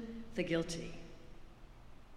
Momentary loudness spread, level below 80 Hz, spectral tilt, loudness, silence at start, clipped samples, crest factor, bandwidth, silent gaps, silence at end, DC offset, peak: 23 LU; -54 dBFS; -5 dB/octave; -40 LUFS; 0 s; under 0.1%; 20 dB; 14.5 kHz; none; 0 s; under 0.1%; -22 dBFS